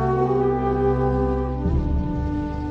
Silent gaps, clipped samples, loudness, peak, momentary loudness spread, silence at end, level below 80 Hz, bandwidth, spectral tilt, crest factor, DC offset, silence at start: none; under 0.1%; -22 LUFS; -8 dBFS; 5 LU; 0 s; -28 dBFS; 6 kHz; -10 dB/octave; 12 dB; under 0.1%; 0 s